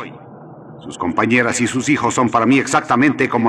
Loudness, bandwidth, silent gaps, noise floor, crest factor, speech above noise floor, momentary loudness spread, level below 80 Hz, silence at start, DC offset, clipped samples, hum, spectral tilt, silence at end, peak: -16 LUFS; 12 kHz; none; -37 dBFS; 16 dB; 22 dB; 14 LU; -58 dBFS; 0 s; under 0.1%; under 0.1%; none; -4.5 dB/octave; 0 s; -2 dBFS